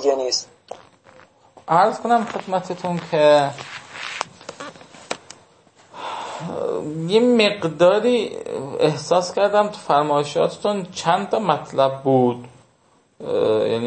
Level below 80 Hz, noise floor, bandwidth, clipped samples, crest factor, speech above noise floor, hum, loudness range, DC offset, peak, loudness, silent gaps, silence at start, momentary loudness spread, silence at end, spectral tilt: -68 dBFS; -59 dBFS; 8.8 kHz; under 0.1%; 18 dB; 40 dB; none; 6 LU; under 0.1%; -2 dBFS; -20 LUFS; none; 0 s; 18 LU; 0 s; -5 dB/octave